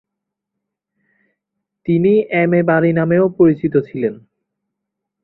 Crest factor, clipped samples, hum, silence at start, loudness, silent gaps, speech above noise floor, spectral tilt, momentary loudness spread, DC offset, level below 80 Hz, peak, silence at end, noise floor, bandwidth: 16 dB; under 0.1%; none; 1.85 s; -15 LUFS; none; 66 dB; -12 dB/octave; 9 LU; under 0.1%; -56 dBFS; -2 dBFS; 1.1 s; -80 dBFS; 4.1 kHz